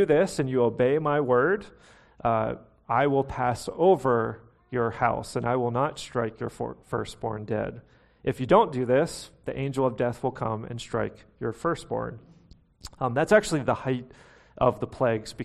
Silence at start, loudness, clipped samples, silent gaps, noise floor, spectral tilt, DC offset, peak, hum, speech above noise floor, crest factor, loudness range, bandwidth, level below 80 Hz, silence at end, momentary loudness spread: 0 s; -26 LUFS; under 0.1%; none; -56 dBFS; -6.5 dB/octave; under 0.1%; -6 dBFS; none; 30 dB; 20 dB; 5 LU; 13 kHz; -52 dBFS; 0 s; 12 LU